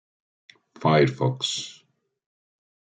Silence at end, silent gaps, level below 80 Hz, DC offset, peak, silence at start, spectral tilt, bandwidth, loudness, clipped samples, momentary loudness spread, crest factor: 1.15 s; none; -66 dBFS; under 0.1%; -6 dBFS; 0.8 s; -5 dB/octave; 9.4 kHz; -23 LUFS; under 0.1%; 11 LU; 22 dB